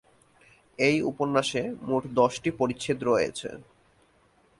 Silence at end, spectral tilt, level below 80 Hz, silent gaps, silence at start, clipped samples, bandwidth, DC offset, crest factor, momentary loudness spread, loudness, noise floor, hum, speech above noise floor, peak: 0.95 s; -5 dB/octave; -62 dBFS; none; 0.8 s; under 0.1%; 11.5 kHz; under 0.1%; 20 dB; 8 LU; -27 LUFS; -63 dBFS; none; 37 dB; -8 dBFS